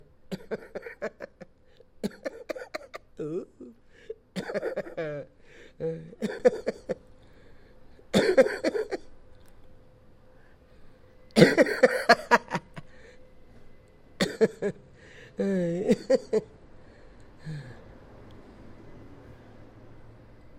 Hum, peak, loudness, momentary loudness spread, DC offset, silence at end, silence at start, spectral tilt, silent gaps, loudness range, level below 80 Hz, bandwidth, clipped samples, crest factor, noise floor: none; 0 dBFS; -27 LUFS; 26 LU; under 0.1%; 0 s; 0.3 s; -5.5 dB/octave; none; 15 LU; -56 dBFS; 16 kHz; under 0.1%; 30 dB; -56 dBFS